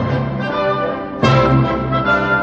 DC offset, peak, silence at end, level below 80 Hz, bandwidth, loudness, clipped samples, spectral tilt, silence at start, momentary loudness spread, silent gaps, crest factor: under 0.1%; -2 dBFS; 0 s; -34 dBFS; 7.4 kHz; -16 LUFS; under 0.1%; -7.5 dB/octave; 0 s; 7 LU; none; 14 dB